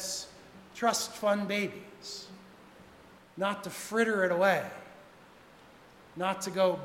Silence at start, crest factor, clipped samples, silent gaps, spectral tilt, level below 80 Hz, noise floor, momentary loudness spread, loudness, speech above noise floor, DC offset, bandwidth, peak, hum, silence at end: 0 s; 20 dB; under 0.1%; none; -3.5 dB/octave; -72 dBFS; -56 dBFS; 22 LU; -31 LUFS; 25 dB; under 0.1%; 16 kHz; -12 dBFS; none; 0 s